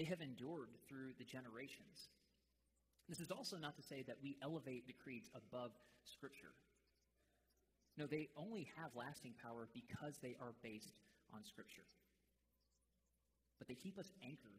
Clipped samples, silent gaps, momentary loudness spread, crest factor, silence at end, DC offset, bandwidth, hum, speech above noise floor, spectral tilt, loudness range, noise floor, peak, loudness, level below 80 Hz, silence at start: under 0.1%; none; 13 LU; 22 dB; 0 s; under 0.1%; 15.5 kHz; none; 32 dB; -5 dB/octave; 8 LU; -86 dBFS; -34 dBFS; -54 LUFS; -86 dBFS; 0 s